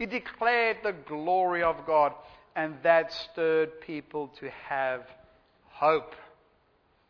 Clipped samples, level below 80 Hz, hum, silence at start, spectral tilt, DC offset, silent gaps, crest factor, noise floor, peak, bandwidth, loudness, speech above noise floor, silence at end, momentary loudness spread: under 0.1%; -64 dBFS; none; 0 s; -6 dB/octave; under 0.1%; none; 20 dB; -67 dBFS; -8 dBFS; 5.4 kHz; -28 LUFS; 39 dB; 0.85 s; 14 LU